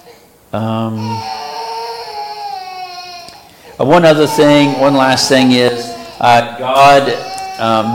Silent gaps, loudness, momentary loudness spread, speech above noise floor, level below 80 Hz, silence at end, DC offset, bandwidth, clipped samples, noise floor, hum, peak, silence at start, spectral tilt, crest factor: none; -11 LUFS; 17 LU; 32 dB; -48 dBFS; 0 s; under 0.1%; 17 kHz; under 0.1%; -42 dBFS; none; 0 dBFS; 0.1 s; -4.5 dB/octave; 12 dB